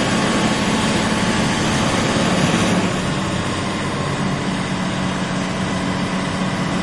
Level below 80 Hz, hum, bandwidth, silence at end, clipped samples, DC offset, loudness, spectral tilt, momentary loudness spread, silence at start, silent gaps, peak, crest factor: -38 dBFS; none; 11.5 kHz; 0 s; under 0.1%; under 0.1%; -19 LUFS; -4.5 dB/octave; 5 LU; 0 s; none; -4 dBFS; 16 dB